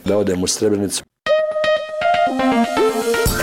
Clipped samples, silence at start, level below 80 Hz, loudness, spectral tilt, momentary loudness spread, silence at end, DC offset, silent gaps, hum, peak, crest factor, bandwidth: under 0.1%; 0.05 s; -36 dBFS; -18 LUFS; -4 dB/octave; 3 LU; 0 s; under 0.1%; none; none; -8 dBFS; 10 dB; 17 kHz